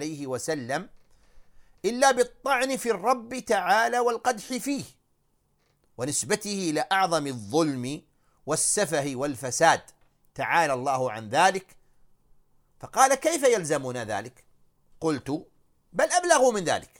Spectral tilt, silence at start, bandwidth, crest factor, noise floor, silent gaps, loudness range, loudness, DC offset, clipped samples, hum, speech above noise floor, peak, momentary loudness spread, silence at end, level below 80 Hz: -3 dB/octave; 0 s; 18 kHz; 22 dB; -69 dBFS; none; 3 LU; -25 LUFS; under 0.1%; under 0.1%; none; 44 dB; -4 dBFS; 12 LU; 0.15 s; -62 dBFS